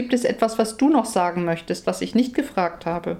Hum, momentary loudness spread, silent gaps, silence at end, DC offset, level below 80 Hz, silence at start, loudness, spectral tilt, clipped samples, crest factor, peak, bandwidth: none; 6 LU; none; 0 s; under 0.1%; -54 dBFS; 0 s; -22 LUFS; -5.5 dB/octave; under 0.1%; 16 dB; -6 dBFS; 15.5 kHz